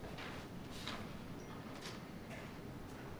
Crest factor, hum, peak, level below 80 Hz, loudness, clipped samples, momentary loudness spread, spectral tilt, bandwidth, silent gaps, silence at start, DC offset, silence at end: 22 dB; none; -28 dBFS; -60 dBFS; -49 LUFS; under 0.1%; 4 LU; -5 dB/octave; over 20 kHz; none; 0 s; under 0.1%; 0 s